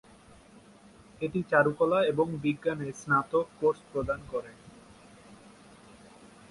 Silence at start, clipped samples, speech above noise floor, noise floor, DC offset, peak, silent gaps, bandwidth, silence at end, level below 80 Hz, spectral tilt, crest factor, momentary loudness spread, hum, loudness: 1.2 s; under 0.1%; 27 dB; -55 dBFS; under 0.1%; -10 dBFS; none; 11.5 kHz; 0.25 s; -58 dBFS; -6.5 dB/octave; 22 dB; 12 LU; none; -29 LUFS